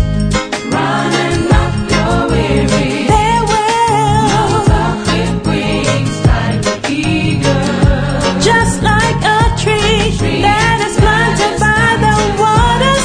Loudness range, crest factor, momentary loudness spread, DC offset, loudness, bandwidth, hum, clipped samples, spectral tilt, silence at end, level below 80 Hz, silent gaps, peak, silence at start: 2 LU; 12 dB; 4 LU; under 0.1%; -12 LUFS; 10.5 kHz; none; under 0.1%; -5 dB/octave; 0 s; -22 dBFS; none; 0 dBFS; 0 s